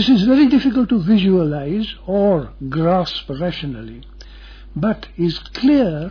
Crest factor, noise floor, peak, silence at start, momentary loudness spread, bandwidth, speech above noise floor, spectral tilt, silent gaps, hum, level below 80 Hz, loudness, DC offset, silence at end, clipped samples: 14 dB; -37 dBFS; -4 dBFS; 0 s; 12 LU; 5.4 kHz; 21 dB; -8 dB/octave; none; none; -38 dBFS; -17 LUFS; under 0.1%; 0 s; under 0.1%